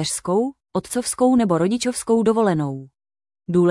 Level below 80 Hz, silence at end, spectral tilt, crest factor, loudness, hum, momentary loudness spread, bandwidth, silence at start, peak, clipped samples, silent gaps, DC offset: -56 dBFS; 0 s; -5.5 dB/octave; 14 dB; -20 LUFS; none; 11 LU; 12 kHz; 0 s; -6 dBFS; under 0.1%; none; under 0.1%